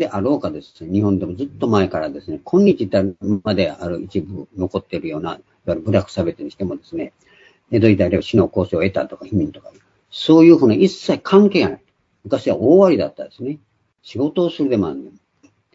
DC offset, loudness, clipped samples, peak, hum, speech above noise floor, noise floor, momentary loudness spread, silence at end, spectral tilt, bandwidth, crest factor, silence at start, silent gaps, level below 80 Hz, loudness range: under 0.1%; -18 LUFS; under 0.1%; 0 dBFS; none; 39 dB; -57 dBFS; 17 LU; 0.65 s; -7.5 dB/octave; 7.8 kHz; 18 dB; 0 s; none; -50 dBFS; 8 LU